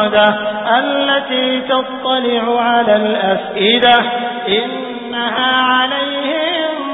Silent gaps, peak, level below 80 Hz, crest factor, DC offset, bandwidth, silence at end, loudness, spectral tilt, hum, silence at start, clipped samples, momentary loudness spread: none; 0 dBFS; -54 dBFS; 14 dB; under 0.1%; 4 kHz; 0 s; -14 LUFS; -7 dB/octave; none; 0 s; under 0.1%; 7 LU